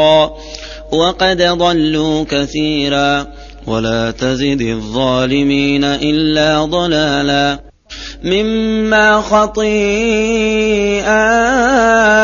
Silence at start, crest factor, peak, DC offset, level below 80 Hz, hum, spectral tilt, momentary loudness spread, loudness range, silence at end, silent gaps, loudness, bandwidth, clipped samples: 0 s; 12 dB; 0 dBFS; under 0.1%; -34 dBFS; none; -4.5 dB/octave; 8 LU; 3 LU; 0 s; none; -13 LUFS; 7.4 kHz; under 0.1%